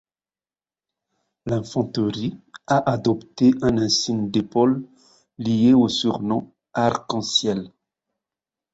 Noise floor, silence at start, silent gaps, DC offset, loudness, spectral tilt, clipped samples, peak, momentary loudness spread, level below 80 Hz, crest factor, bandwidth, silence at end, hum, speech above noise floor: under -90 dBFS; 1.45 s; none; under 0.1%; -21 LUFS; -5 dB/octave; under 0.1%; -4 dBFS; 13 LU; -54 dBFS; 18 dB; 8 kHz; 1.05 s; none; over 70 dB